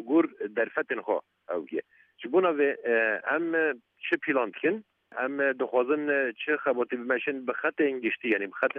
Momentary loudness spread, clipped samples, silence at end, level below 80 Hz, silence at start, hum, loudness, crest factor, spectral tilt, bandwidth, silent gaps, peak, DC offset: 8 LU; under 0.1%; 0 s; -86 dBFS; 0 s; none; -28 LUFS; 18 dB; -7.5 dB/octave; 4 kHz; none; -10 dBFS; under 0.1%